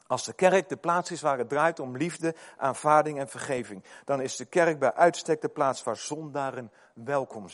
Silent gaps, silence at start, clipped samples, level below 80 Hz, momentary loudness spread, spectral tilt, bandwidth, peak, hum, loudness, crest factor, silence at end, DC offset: none; 0.1 s; under 0.1%; -74 dBFS; 11 LU; -4.5 dB/octave; 11.5 kHz; -6 dBFS; none; -27 LUFS; 22 dB; 0 s; under 0.1%